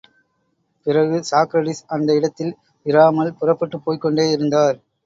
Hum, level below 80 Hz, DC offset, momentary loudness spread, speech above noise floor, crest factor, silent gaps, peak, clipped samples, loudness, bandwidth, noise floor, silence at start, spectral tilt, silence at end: none; -66 dBFS; under 0.1%; 10 LU; 50 dB; 16 dB; none; -2 dBFS; under 0.1%; -18 LUFS; 7.8 kHz; -68 dBFS; 0.85 s; -6 dB/octave; 0.3 s